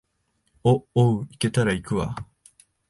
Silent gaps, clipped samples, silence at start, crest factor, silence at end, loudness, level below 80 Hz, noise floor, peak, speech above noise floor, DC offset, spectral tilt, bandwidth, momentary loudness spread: none; under 0.1%; 0.65 s; 18 dB; 0.65 s; -23 LUFS; -48 dBFS; -71 dBFS; -6 dBFS; 49 dB; under 0.1%; -6.5 dB/octave; 11.5 kHz; 11 LU